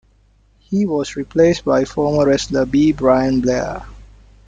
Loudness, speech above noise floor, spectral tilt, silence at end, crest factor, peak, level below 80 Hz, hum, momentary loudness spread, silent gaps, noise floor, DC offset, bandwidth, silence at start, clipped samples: -17 LUFS; 38 dB; -6 dB/octave; 0.5 s; 16 dB; -2 dBFS; -40 dBFS; none; 8 LU; none; -54 dBFS; under 0.1%; 9.2 kHz; 0.7 s; under 0.1%